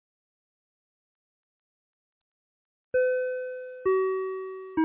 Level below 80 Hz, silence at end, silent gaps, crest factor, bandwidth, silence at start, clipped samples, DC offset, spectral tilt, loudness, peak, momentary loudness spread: -70 dBFS; 0 s; none; 16 dB; 3.8 kHz; 2.95 s; under 0.1%; under 0.1%; -4.5 dB/octave; -29 LUFS; -16 dBFS; 9 LU